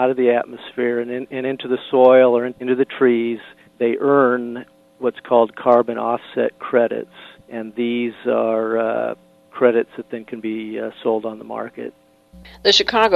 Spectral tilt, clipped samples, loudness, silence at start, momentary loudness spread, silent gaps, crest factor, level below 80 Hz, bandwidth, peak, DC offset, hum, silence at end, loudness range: -4.5 dB/octave; under 0.1%; -19 LUFS; 0 s; 16 LU; none; 18 dB; -58 dBFS; 7.6 kHz; 0 dBFS; under 0.1%; none; 0 s; 6 LU